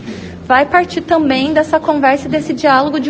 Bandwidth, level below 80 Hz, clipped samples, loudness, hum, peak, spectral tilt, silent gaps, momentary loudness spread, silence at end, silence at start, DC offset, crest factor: 9 kHz; -44 dBFS; under 0.1%; -13 LUFS; none; 0 dBFS; -5.5 dB/octave; none; 6 LU; 0 s; 0 s; under 0.1%; 14 dB